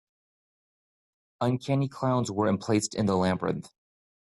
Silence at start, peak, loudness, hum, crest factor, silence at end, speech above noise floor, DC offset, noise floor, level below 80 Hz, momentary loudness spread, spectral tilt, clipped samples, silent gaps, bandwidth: 1.4 s; -12 dBFS; -28 LUFS; none; 18 dB; 0.55 s; over 63 dB; under 0.1%; under -90 dBFS; -64 dBFS; 5 LU; -6 dB/octave; under 0.1%; none; 12 kHz